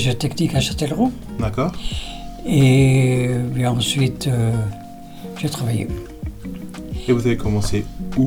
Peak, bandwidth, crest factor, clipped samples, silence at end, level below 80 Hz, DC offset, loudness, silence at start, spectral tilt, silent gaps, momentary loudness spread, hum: -4 dBFS; 16.5 kHz; 14 dB; under 0.1%; 0 s; -34 dBFS; under 0.1%; -20 LUFS; 0 s; -6 dB/octave; none; 17 LU; none